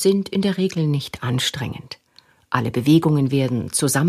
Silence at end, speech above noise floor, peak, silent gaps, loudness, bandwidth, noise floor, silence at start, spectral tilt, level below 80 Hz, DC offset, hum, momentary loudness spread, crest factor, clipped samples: 0 s; 36 dB; 0 dBFS; none; -20 LUFS; 15.5 kHz; -55 dBFS; 0 s; -5 dB/octave; -54 dBFS; under 0.1%; none; 13 LU; 20 dB; under 0.1%